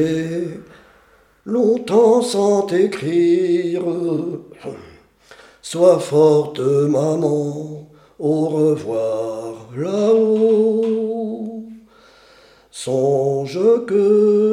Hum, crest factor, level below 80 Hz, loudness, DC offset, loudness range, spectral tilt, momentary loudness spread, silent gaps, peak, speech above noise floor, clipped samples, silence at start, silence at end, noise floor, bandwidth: none; 16 dB; -62 dBFS; -17 LUFS; under 0.1%; 3 LU; -6.5 dB/octave; 17 LU; none; -2 dBFS; 36 dB; under 0.1%; 0 s; 0 s; -53 dBFS; 12 kHz